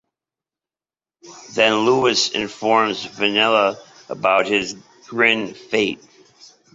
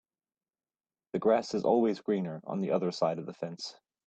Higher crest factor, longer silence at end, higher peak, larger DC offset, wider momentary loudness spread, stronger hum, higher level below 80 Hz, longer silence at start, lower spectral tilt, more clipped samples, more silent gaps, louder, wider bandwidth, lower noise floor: about the same, 20 dB vs 18 dB; first, 0.8 s vs 0.35 s; first, -2 dBFS vs -14 dBFS; neither; about the same, 14 LU vs 12 LU; neither; first, -62 dBFS vs -76 dBFS; about the same, 1.25 s vs 1.15 s; second, -3 dB/octave vs -6.5 dB/octave; neither; neither; first, -18 LUFS vs -31 LUFS; second, 7.8 kHz vs 8.8 kHz; about the same, under -90 dBFS vs under -90 dBFS